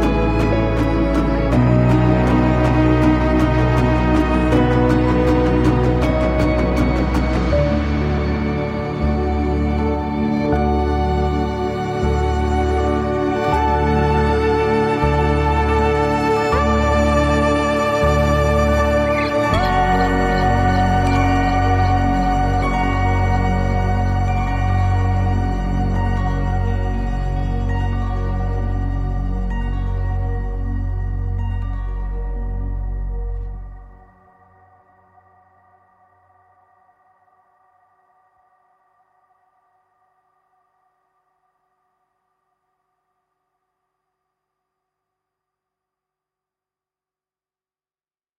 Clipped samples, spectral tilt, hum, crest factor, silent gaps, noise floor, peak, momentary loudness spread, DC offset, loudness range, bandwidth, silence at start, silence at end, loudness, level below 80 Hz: under 0.1%; -7.5 dB/octave; none; 16 dB; none; under -90 dBFS; -2 dBFS; 9 LU; under 0.1%; 9 LU; 12 kHz; 0 s; 14.45 s; -18 LUFS; -24 dBFS